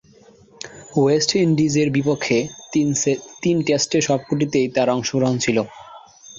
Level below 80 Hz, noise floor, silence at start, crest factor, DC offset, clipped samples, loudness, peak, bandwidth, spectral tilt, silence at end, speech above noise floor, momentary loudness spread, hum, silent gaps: -56 dBFS; -50 dBFS; 0.65 s; 18 dB; under 0.1%; under 0.1%; -19 LUFS; -2 dBFS; 7.8 kHz; -4.5 dB/octave; 0 s; 31 dB; 7 LU; none; none